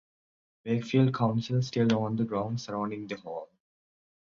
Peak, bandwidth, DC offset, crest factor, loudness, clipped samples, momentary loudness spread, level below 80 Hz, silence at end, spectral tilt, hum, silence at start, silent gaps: -12 dBFS; 7.4 kHz; under 0.1%; 18 dB; -29 LUFS; under 0.1%; 12 LU; -66 dBFS; 0.85 s; -7.5 dB/octave; none; 0.65 s; none